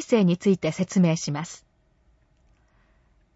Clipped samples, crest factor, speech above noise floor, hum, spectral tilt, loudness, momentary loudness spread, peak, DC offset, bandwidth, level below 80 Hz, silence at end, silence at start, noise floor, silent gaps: under 0.1%; 18 dB; 40 dB; none; -6.5 dB/octave; -23 LUFS; 14 LU; -8 dBFS; under 0.1%; 8 kHz; -62 dBFS; 1.8 s; 0 s; -63 dBFS; none